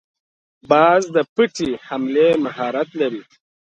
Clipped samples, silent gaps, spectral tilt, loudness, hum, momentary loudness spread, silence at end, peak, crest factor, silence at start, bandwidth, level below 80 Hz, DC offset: under 0.1%; 1.29-1.36 s; -5 dB/octave; -18 LUFS; none; 10 LU; 0.55 s; -2 dBFS; 18 dB; 0.7 s; 8.8 kHz; -60 dBFS; under 0.1%